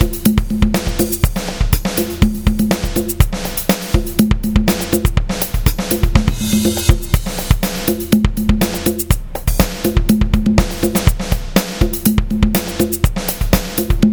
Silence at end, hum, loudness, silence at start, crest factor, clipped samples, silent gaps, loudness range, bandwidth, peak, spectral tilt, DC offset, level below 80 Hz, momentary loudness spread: 0 s; none; -16 LUFS; 0 s; 14 dB; under 0.1%; none; 1 LU; over 20 kHz; 0 dBFS; -5 dB/octave; under 0.1%; -20 dBFS; 4 LU